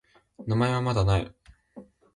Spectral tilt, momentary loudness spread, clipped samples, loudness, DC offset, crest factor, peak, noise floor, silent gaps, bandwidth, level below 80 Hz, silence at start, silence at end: -7 dB/octave; 15 LU; under 0.1%; -26 LUFS; under 0.1%; 16 dB; -12 dBFS; -50 dBFS; none; 11.5 kHz; -42 dBFS; 0.4 s; 0.35 s